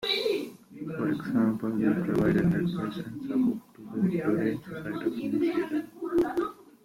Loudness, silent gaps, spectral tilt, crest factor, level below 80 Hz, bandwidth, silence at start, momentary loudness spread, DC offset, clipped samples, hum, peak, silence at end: -29 LUFS; none; -7 dB/octave; 16 dB; -58 dBFS; 16.5 kHz; 0 s; 11 LU; under 0.1%; under 0.1%; none; -12 dBFS; 0.2 s